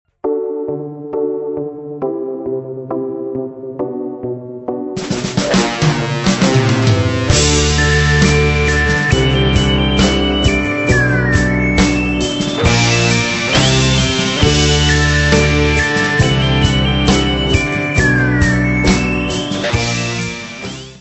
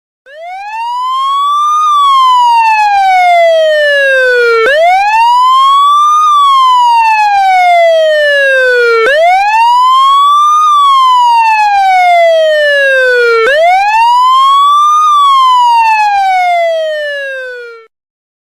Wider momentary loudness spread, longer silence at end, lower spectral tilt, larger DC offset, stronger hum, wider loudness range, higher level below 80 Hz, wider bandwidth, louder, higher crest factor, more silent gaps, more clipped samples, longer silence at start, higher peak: first, 12 LU vs 6 LU; second, 0 s vs 0.65 s; first, -4.5 dB/octave vs 1 dB/octave; neither; neither; first, 10 LU vs 2 LU; first, -24 dBFS vs -52 dBFS; second, 8.4 kHz vs 15.5 kHz; second, -14 LUFS vs -6 LUFS; first, 14 dB vs 4 dB; neither; neither; about the same, 0.25 s vs 0.3 s; about the same, 0 dBFS vs -2 dBFS